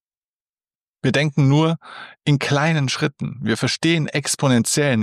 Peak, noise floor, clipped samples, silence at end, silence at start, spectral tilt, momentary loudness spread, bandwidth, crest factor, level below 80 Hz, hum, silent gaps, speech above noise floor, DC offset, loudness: -6 dBFS; under -90 dBFS; under 0.1%; 0 s; 1.05 s; -5 dB/octave; 8 LU; 14 kHz; 14 dB; -60 dBFS; none; none; over 71 dB; under 0.1%; -19 LUFS